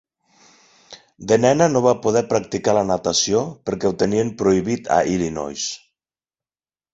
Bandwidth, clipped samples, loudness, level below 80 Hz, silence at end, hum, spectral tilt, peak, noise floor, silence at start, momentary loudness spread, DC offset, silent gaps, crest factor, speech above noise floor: 8 kHz; under 0.1%; -19 LUFS; -52 dBFS; 1.15 s; none; -4.5 dB/octave; -2 dBFS; under -90 dBFS; 0.9 s; 10 LU; under 0.1%; none; 20 dB; over 71 dB